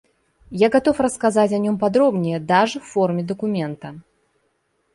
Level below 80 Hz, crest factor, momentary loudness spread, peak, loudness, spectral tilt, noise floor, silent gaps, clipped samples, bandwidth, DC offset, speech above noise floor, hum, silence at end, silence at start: -56 dBFS; 16 dB; 10 LU; -4 dBFS; -19 LUFS; -6 dB/octave; -68 dBFS; none; under 0.1%; 11.5 kHz; under 0.1%; 49 dB; none; 0.95 s; 0.5 s